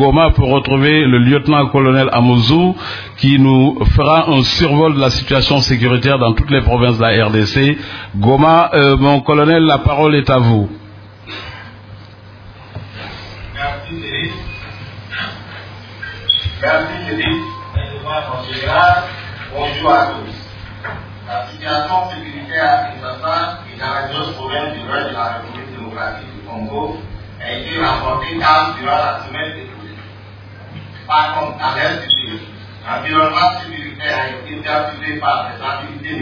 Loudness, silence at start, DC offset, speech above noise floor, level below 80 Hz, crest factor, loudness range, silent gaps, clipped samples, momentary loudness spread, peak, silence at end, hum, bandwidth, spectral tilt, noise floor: -14 LUFS; 0 s; under 0.1%; 23 dB; -30 dBFS; 14 dB; 12 LU; none; under 0.1%; 19 LU; 0 dBFS; 0 s; none; 5.4 kHz; -6.5 dB/octave; -36 dBFS